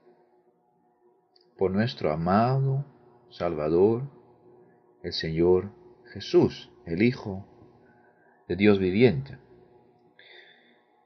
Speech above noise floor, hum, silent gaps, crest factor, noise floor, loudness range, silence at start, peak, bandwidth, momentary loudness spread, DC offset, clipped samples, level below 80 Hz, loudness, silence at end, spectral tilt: 43 dB; none; none; 22 dB; -67 dBFS; 2 LU; 1.6 s; -6 dBFS; 6.4 kHz; 19 LU; under 0.1%; under 0.1%; -52 dBFS; -25 LUFS; 1.7 s; -8 dB/octave